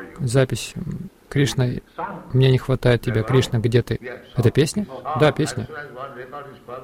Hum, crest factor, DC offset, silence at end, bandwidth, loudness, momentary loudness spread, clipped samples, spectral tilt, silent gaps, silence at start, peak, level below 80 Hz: none; 16 dB; under 0.1%; 0 s; 15.5 kHz; -21 LUFS; 16 LU; under 0.1%; -6 dB/octave; none; 0 s; -4 dBFS; -42 dBFS